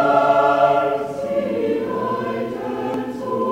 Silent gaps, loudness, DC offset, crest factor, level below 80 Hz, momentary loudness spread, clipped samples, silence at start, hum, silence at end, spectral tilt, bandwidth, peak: none; -20 LUFS; under 0.1%; 18 dB; -58 dBFS; 10 LU; under 0.1%; 0 s; none; 0 s; -6.5 dB/octave; 15.5 kHz; -2 dBFS